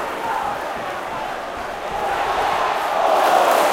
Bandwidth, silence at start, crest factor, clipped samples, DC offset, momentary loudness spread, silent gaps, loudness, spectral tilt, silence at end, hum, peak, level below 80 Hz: 17 kHz; 0 s; 18 dB; under 0.1%; under 0.1%; 12 LU; none; -20 LUFS; -2.5 dB/octave; 0 s; none; -2 dBFS; -48 dBFS